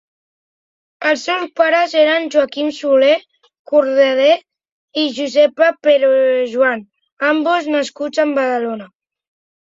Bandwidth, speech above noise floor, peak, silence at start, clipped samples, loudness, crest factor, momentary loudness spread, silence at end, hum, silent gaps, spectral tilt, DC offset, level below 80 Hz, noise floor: 7.8 kHz; over 76 dB; -2 dBFS; 1 s; under 0.1%; -15 LUFS; 14 dB; 8 LU; 0.85 s; none; 3.59-3.65 s, 4.72-4.88 s, 7.12-7.17 s; -3 dB/octave; under 0.1%; -68 dBFS; under -90 dBFS